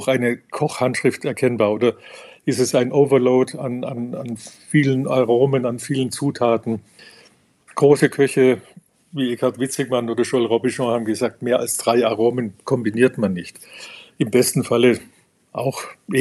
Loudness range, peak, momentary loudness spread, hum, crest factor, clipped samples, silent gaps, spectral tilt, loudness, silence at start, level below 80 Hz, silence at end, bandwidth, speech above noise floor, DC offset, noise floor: 2 LU; -2 dBFS; 13 LU; none; 18 dB; under 0.1%; none; -5.5 dB/octave; -19 LUFS; 0 s; -70 dBFS; 0 s; 13.5 kHz; 34 dB; under 0.1%; -53 dBFS